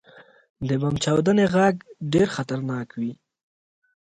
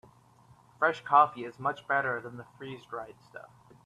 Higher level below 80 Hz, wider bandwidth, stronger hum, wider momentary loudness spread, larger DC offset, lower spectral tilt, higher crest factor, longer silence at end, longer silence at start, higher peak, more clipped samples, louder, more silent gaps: first, -54 dBFS vs -74 dBFS; second, 9.4 kHz vs 11.5 kHz; neither; second, 13 LU vs 23 LU; neither; about the same, -6 dB/octave vs -6 dB/octave; about the same, 18 dB vs 22 dB; first, 0.9 s vs 0.4 s; second, 0.15 s vs 0.8 s; about the same, -6 dBFS vs -8 dBFS; neither; first, -23 LUFS vs -29 LUFS; first, 0.50-0.55 s vs none